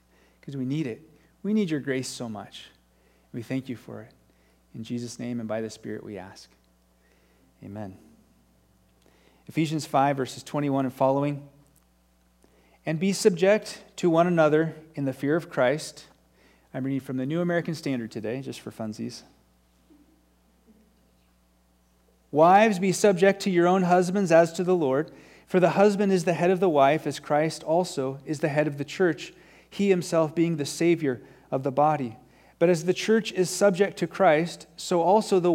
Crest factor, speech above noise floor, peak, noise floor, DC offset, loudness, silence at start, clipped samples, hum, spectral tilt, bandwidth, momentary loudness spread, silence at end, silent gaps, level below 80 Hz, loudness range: 20 dB; 39 dB; -6 dBFS; -63 dBFS; under 0.1%; -25 LUFS; 0.45 s; under 0.1%; none; -6 dB/octave; 16 kHz; 18 LU; 0 s; none; -66 dBFS; 15 LU